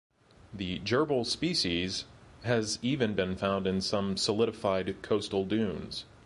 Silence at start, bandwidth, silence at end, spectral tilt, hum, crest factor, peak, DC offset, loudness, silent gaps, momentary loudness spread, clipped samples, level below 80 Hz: 0.45 s; 11.5 kHz; 0.2 s; -4.5 dB/octave; none; 18 dB; -14 dBFS; under 0.1%; -31 LUFS; none; 10 LU; under 0.1%; -54 dBFS